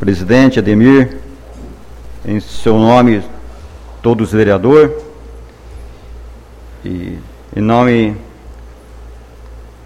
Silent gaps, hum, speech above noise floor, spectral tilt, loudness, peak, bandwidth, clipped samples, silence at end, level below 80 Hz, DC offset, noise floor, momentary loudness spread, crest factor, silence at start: none; none; 24 dB; -7.5 dB/octave; -11 LUFS; 0 dBFS; 11.5 kHz; 0.2%; 0.15 s; -34 dBFS; under 0.1%; -34 dBFS; 25 LU; 14 dB; 0 s